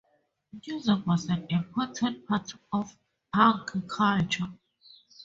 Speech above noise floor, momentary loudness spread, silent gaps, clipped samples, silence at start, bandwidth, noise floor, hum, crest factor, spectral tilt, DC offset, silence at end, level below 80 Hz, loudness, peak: 43 dB; 11 LU; none; under 0.1%; 0.55 s; 7.8 kHz; -71 dBFS; none; 22 dB; -5.5 dB/octave; under 0.1%; 0 s; -62 dBFS; -28 LUFS; -6 dBFS